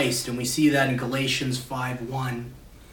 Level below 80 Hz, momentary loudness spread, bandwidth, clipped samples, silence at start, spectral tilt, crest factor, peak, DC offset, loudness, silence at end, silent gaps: -52 dBFS; 10 LU; 18 kHz; under 0.1%; 0 s; -4.5 dB/octave; 16 dB; -10 dBFS; under 0.1%; -25 LUFS; 0 s; none